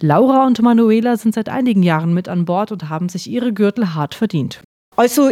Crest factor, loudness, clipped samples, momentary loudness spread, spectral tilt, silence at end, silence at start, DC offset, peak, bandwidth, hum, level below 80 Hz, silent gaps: 14 dB; -16 LUFS; under 0.1%; 10 LU; -7 dB/octave; 0 s; 0 s; under 0.1%; 0 dBFS; 16 kHz; none; -62 dBFS; 4.64-4.92 s